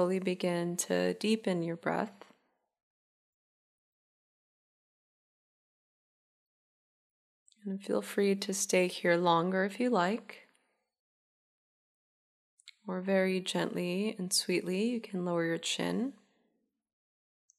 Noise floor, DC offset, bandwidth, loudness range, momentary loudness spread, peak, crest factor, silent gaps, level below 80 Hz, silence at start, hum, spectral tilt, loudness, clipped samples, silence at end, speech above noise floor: -79 dBFS; under 0.1%; 15 kHz; 10 LU; 10 LU; -14 dBFS; 22 dB; 2.83-7.46 s, 10.99-12.58 s; -86 dBFS; 0 s; none; -4.5 dB/octave; -32 LUFS; under 0.1%; 1.45 s; 47 dB